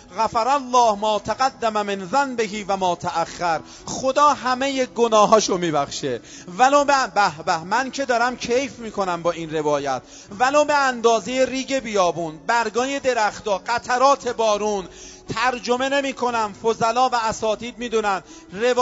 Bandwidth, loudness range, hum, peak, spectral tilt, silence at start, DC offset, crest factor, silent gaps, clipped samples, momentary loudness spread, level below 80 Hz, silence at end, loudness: 8 kHz; 3 LU; none; -2 dBFS; -3.5 dB/octave; 0.1 s; under 0.1%; 20 dB; none; under 0.1%; 9 LU; -54 dBFS; 0 s; -21 LUFS